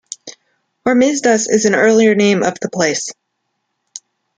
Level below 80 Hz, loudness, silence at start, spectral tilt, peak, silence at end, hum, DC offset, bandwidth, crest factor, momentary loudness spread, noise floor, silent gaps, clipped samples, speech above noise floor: -60 dBFS; -14 LUFS; 0.25 s; -4 dB/octave; 0 dBFS; 0.4 s; none; under 0.1%; 9.6 kHz; 14 dB; 23 LU; -71 dBFS; none; under 0.1%; 58 dB